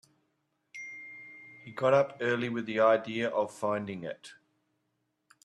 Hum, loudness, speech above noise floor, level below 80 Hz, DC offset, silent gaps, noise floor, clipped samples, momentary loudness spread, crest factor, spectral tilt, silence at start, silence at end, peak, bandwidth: none; -29 LUFS; 50 dB; -76 dBFS; under 0.1%; none; -79 dBFS; under 0.1%; 21 LU; 20 dB; -6 dB/octave; 0.75 s; 1.1 s; -12 dBFS; 11.5 kHz